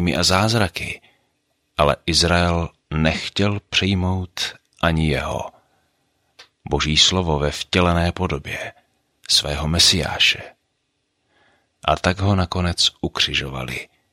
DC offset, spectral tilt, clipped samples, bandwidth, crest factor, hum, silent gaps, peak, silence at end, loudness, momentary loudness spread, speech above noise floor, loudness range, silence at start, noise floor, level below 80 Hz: under 0.1%; -3.5 dB/octave; under 0.1%; 16 kHz; 20 dB; none; none; -2 dBFS; 0.25 s; -19 LUFS; 14 LU; 52 dB; 3 LU; 0 s; -71 dBFS; -36 dBFS